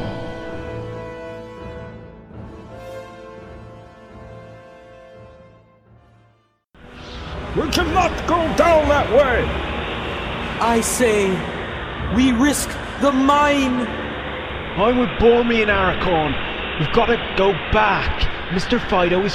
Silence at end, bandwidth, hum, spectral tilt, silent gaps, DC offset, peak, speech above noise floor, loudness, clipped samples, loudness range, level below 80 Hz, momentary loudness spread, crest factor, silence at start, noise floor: 0 s; 15.5 kHz; none; -4.5 dB/octave; none; under 0.1%; -2 dBFS; 42 dB; -19 LUFS; under 0.1%; 20 LU; -34 dBFS; 22 LU; 18 dB; 0 s; -58 dBFS